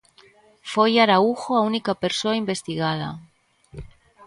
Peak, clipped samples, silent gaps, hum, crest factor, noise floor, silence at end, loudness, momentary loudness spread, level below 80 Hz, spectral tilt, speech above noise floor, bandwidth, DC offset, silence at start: -4 dBFS; under 0.1%; none; none; 18 dB; -54 dBFS; 0 s; -21 LUFS; 24 LU; -54 dBFS; -5 dB/octave; 33 dB; 11.5 kHz; under 0.1%; 0.65 s